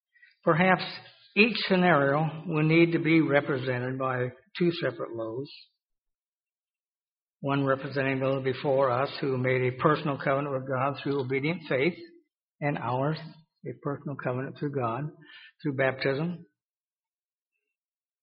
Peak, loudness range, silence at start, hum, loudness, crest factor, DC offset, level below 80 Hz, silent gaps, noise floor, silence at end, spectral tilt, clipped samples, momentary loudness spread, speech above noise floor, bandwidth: -6 dBFS; 9 LU; 0.45 s; none; -27 LUFS; 22 dB; under 0.1%; -68 dBFS; 5.98-6.02 s, 6.22-6.44 s, 6.88-7.16 s, 7.22-7.27 s, 12.43-12.49 s; under -90 dBFS; 1.8 s; -5 dB/octave; under 0.1%; 13 LU; over 63 dB; 5.4 kHz